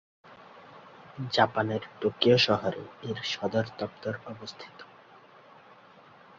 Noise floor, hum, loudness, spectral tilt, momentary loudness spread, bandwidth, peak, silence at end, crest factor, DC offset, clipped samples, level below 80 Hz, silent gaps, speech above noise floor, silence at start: -54 dBFS; none; -28 LUFS; -5.5 dB/octave; 27 LU; 7.6 kHz; -8 dBFS; 1.55 s; 24 dB; under 0.1%; under 0.1%; -66 dBFS; none; 26 dB; 0.25 s